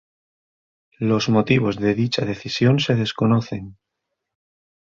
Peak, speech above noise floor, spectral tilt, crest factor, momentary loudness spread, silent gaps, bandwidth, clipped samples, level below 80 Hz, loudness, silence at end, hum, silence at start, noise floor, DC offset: -2 dBFS; 60 dB; -6.5 dB/octave; 18 dB; 8 LU; none; 7.4 kHz; under 0.1%; -54 dBFS; -20 LUFS; 1.15 s; none; 1 s; -80 dBFS; under 0.1%